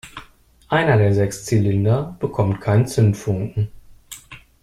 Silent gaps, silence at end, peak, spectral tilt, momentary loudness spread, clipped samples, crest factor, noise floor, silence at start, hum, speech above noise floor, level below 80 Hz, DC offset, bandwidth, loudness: none; 0.25 s; -4 dBFS; -7 dB/octave; 21 LU; under 0.1%; 16 dB; -49 dBFS; 0.05 s; none; 31 dB; -46 dBFS; under 0.1%; 13 kHz; -19 LUFS